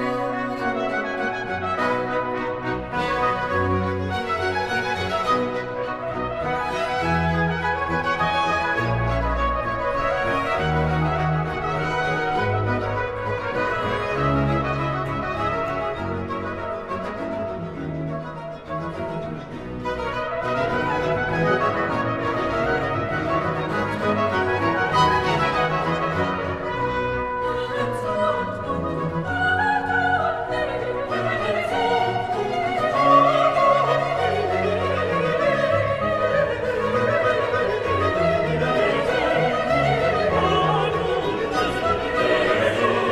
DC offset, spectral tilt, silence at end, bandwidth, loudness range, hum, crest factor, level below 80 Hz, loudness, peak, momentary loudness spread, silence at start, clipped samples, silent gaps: under 0.1%; -6 dB/octave; 0 s; 13 kHz; 6 LU; none; 18 dB; -40 dBFS; -22 LUFS; -4 dBFS; 8 LU; 0 s; under 0.1%; none